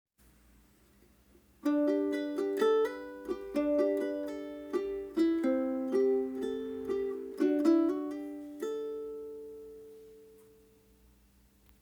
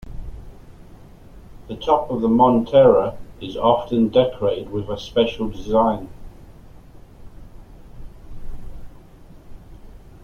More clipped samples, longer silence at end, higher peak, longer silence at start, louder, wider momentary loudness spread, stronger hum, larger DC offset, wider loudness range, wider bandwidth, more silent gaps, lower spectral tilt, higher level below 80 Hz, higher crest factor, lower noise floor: neither; first, 1.5 s vs 0.1 s; second, -16 dBFS vs -2 dBFS; first, 1.65 s vs 0.05 s; second, -32 LUFS vs -19 LUFS; second, 15 LU vs 25 LU; neither; neither; about the same, 11 LU vs 9 LU; first, over 20 kHz vs 6.8 kHz; neither; second, -5.5 dB/octave vs -7.5 dB/octave; second, -66 dBFS vs -40 dBFS; about the same, 18 dB vs 20 dB; first, -64 dBFS vs -43 dBFS